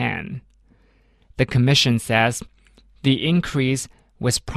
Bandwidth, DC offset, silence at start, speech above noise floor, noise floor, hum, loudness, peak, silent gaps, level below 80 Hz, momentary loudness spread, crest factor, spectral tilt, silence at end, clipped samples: 13.5 kHz; under 0.1%; 0 s; 38 dB; -57 dBFS; none; -20 LUFS; -4 dBFS; none; -44 dBFS; 18 LU; 18 dB; -4.5 dB/octave; 0 s; under 0.1%